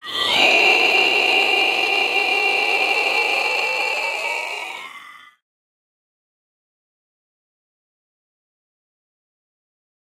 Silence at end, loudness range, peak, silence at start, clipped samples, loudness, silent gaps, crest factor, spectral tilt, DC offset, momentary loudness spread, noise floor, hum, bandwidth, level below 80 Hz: 4.85 s; 15 LU; -2 dBFS; 0.05 s; under 0.1%; -16 LUFS; none; 20 dB; -0.5 dB/octave; under 0.1%; 12 LU; -42 dBFS; none; 16 kHz; -68 dBFS